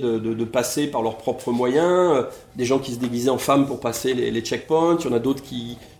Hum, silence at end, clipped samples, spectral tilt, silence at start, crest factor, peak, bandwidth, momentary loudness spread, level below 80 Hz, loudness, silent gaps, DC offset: none; 0.1 s; under 0.1%; -5 dB/octave; 0 s; 16 dB; -4 dBFS; 19 kHz; 8 LU; -54 dBFS; -22 LUFS; none; under 0.1%